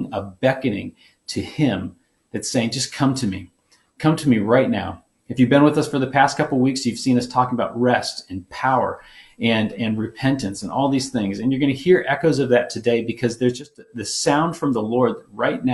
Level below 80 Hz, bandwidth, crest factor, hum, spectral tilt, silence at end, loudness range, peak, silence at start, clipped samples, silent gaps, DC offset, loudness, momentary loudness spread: -54 dBFS; 12 kHz; 20 dB; none; -5.5 dB/octave; 0 s; 4 LU; 0 dBFS; 0 s; under 0.1%; none; under 0.1%; -20 LUFS; 13 LU